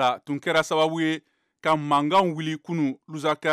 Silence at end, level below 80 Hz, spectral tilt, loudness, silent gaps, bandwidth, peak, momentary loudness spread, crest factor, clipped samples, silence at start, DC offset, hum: 0 s; -72 dBFS; -5 dB/octave; -24 LUFS; none; 14.5 kHz; -10 dBFS; 8 LU; 14 dB; under 0.1%; 0 s; under 0.1%; none